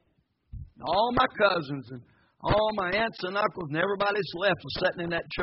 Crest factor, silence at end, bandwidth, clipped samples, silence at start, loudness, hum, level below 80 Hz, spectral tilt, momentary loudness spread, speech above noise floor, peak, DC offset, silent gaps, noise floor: 20 dB; 0 s; 5.8 kHz; under 0.1%; 0.55 s; -27 LUFS; none; -50 dBFS; -3 dB/octave; 14 LU; 44 dB; -8 dBFS; under 0.1%; none; -71 dBFS